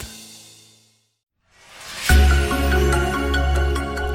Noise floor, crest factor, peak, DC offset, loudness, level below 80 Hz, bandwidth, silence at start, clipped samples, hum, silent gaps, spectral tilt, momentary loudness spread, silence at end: -59 dBFS; 16 dB; -4 dBFS; under 0.1%; -19 LUFS; -22 dBFS; 16.5 kHz; 0 s; under 0.1%; none; none; -5 dB/octave; 21 LU; 0 s